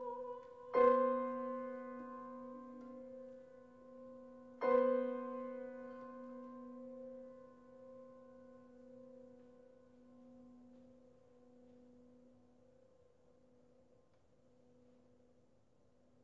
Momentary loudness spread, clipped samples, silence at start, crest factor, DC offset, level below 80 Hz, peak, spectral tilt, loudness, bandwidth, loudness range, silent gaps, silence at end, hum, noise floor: 27 LU; under 0.1%; 0 s; 26 dB; under 0.1%; -80 dBFS; -18 dBFS; -4.5 dB/octave; -40 LUFS; 5.8 kHz; 25 LU; none; 4.1 s; none; -74 dBFS